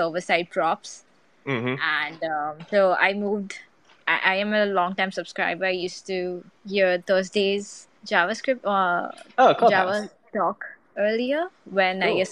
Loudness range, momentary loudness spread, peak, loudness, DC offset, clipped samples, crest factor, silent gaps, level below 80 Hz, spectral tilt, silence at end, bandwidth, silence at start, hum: 3 LU; 12 LU; -2 dBFS; -23 LUFS; under 0.1%; under 0.1%; 22 dB; none; -72 dBFS; -4.5 dB/octave; 0 s; 11 kHz; 0 s; none